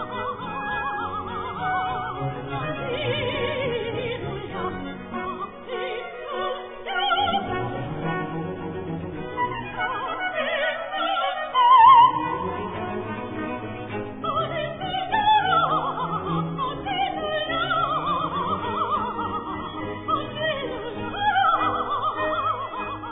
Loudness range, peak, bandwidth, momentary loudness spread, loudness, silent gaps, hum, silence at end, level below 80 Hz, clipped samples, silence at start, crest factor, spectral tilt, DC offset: 9 LU; -4 dBFS; 3.9 kHz; 12 LU; -24 LUFS; none; none; 0 s; -50 dBFS; under 0.1%; 0 s; 20 dB; -8.5 dB/octave; under 0.1%